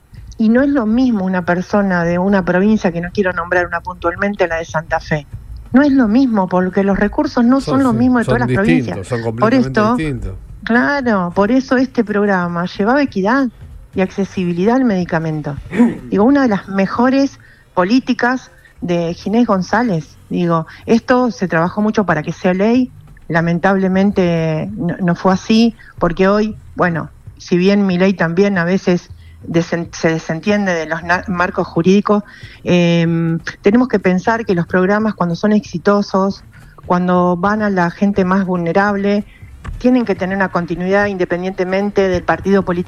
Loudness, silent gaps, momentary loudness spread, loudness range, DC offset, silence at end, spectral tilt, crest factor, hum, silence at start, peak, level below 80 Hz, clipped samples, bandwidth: -15 LUFS; none; 7 LU; 2 LU; under 0.1%; 0 s; -7 dB/octave; 14 dB; none; 0.15 s; 0 dBFS; -40 dBFS; under 0.1%; 10 kHz